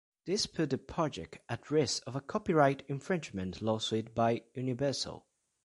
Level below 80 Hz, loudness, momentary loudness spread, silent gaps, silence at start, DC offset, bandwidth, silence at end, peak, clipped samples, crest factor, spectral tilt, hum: -62 dBFS; -33 LUFS; 11 LU; none; 0.25 s; under 0.1%; 11.5 kHz; 0.45 s; -12 dBFS; under 0.1%; 22 dB; -5 dB/octave; none